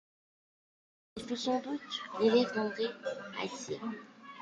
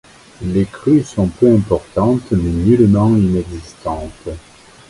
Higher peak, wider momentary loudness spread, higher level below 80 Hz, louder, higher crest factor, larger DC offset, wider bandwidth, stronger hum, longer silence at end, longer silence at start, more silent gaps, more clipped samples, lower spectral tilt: second, -16 dBFS vs 0 dBFS; about the same, 18 LU vs 17 LU; second, -74 dBFS vs -34 dBFS; second, -34 LUFS vs -15 LUFS; first, 20 dB vs 14 dB; neither; about the same, 11 kHz vs 11.5 kHz; neither; second, 0 s vs 0.5 s; first, 1.15 s vs 0.4 s; neither; neither; second, -4 dB/octave vs -8.5 dB/octave